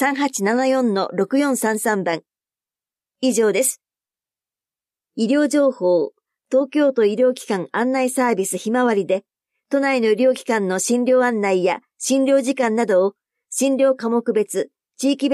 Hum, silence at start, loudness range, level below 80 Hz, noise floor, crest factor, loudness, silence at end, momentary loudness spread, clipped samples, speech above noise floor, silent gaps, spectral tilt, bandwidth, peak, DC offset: none; 0 s; 4 LU; -76 dBFS; under -90 dBFS; 12 dB; -19 LUFS; 0 s; 7 LU; under 0.1%; over 72 dB; none; -4 dB/octave; 15 kHz; -6 dBFS; under 0.1%